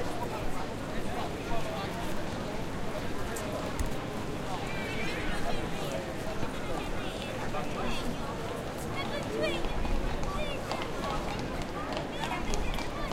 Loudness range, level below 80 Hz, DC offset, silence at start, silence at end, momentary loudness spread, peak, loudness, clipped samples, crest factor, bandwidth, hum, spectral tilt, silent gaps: 2 LU; -38 dBFS; under 0.1%; 0 s; 0 s; 3 LU; -14 dBFS; -35 LUFS; under 0.1%; 18 dB; 16 kHz; none; -5 dB/octave; none